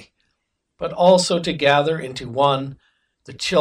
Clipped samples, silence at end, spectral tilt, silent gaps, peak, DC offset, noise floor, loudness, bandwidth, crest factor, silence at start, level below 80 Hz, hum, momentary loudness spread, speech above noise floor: under 0.1%; 0 s; -4.5 dB/octave; none; -2 dBFS; under 0.1%; -74 dBFS; -19 LUFS; 11 kHz; 18 dB; 0.8 s; -54 dBFS; none; 14 LU; 56 dB